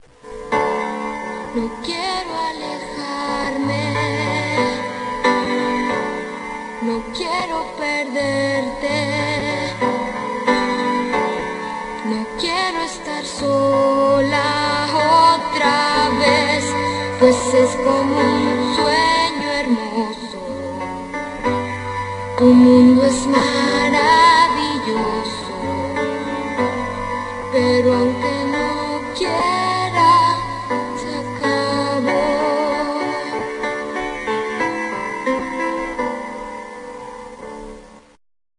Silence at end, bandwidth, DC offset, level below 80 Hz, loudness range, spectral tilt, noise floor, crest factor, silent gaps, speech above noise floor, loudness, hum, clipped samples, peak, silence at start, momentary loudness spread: 0.6 s; 11 kHz; under 0.1%; -46 dBFS; 8 LU; -4.5 dB/octave; -42 dBFS; 18 dB; none; 27 dB; -18 LUFS; none; under 0.1%; 0 dBFS; 0.25 s; 12 LU